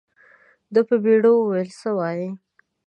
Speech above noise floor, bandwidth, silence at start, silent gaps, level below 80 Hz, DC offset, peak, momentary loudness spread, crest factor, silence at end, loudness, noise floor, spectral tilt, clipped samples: 35 dB; 9.2 kHz; 0.7 s; none; -76 dBFS; under 0.1%; -6 dBFS; 14 LU; 16 dB; 0.5 s; -20 LUFS; -55 dBFS; -8 dB/octave; under 0.1%